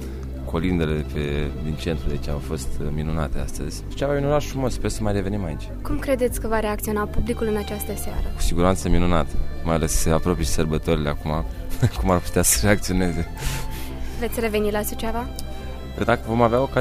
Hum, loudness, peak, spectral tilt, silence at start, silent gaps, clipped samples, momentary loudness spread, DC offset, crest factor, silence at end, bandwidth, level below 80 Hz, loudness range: none; -24 LUFS; -4 dBFS; -5 dB/octave; 0 s; none; under 0.1%; 11 LU; under 0.1%; 18 dB; 0 s; 16 kHz; -28 dBFS; 4 LU